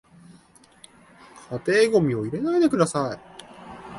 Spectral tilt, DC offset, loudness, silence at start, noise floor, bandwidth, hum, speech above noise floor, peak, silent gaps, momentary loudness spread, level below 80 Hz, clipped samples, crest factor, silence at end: -6 dB/octave; under 0.1%; -22 LUFS; 1.35 s; -54 dBFS; 11.5 kHz; none; 33 dB; -6 dBFS; none; 23 LU; -60 dBFS; under 0.1%; 18 dB; 0 s